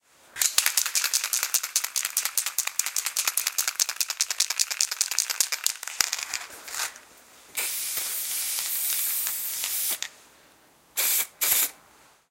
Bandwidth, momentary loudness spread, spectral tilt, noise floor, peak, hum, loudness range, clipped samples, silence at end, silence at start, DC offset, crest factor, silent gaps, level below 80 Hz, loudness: 17 kHz; 9 LU; 4 dB/octave; -58 dBFS; 0 dBFS; none; 3 LU; under 0.1%; 0.55 s; 0.35 s; under 0.1%; 28 dB; none; -74 dBFS; -25 LUFS